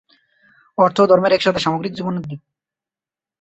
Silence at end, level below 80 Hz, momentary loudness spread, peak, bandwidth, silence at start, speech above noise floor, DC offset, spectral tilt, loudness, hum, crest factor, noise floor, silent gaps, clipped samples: 1.05 s; -56 dBFS; 17 LU; -2 dBFS; 8.2 kHz; 0.8 s; over 73 dB; under 0.1%; -6 dB/octave; -17 LUFS; none; 18 dB; under -90 dBFS; none; under 0.1%